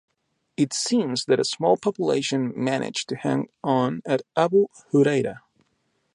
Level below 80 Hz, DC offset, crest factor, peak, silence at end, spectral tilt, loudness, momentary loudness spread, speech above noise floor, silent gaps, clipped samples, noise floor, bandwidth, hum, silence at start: -70 dBFS; under 0.1%; 18 dB; -6 dBFS; 0.75 s; -5 dB/octave; -23 LUFS; 6 LU; 48 dB; none; under 0.1%; -71 dBFS; 11.5 kHz; none; 0.6 s